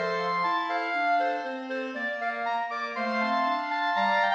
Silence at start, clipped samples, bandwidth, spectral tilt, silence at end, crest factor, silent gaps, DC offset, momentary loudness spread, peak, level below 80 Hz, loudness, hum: 0 s; under 0.1%; 8 kHz; -4.5 dB/octave; 0 s; 14 dB; none; under 0.1%; 6 LU; -14 dBFS; -82 dBFS; -28 LUFS; none